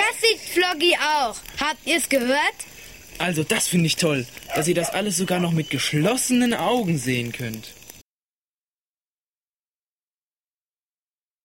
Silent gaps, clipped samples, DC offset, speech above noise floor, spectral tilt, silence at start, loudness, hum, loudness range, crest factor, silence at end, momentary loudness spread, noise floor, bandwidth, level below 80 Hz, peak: none; under 0.1%; under 0.1%; over 68 dB; -3.5 dB/octave; 0 s; -21 LUFS; none; 7 LU; 18 dB; 3.45 s; 11 LU; under -90 dBFS; 16.5 kHz; -56 dBFS; -6 dBFS